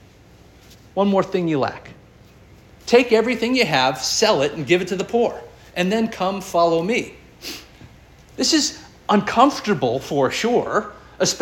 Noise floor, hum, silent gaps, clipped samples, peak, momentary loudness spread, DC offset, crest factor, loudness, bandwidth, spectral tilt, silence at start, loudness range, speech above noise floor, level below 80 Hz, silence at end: -48 dBFS; none; none; under 0.1%; -2 dBFS; 16 LU; under 0.1%; 20 dB; -19 LUFS; 17 kHz; -4 dB/octave; 0.95 s; 4 LU; 29 dB; -52 dBFS; 0 s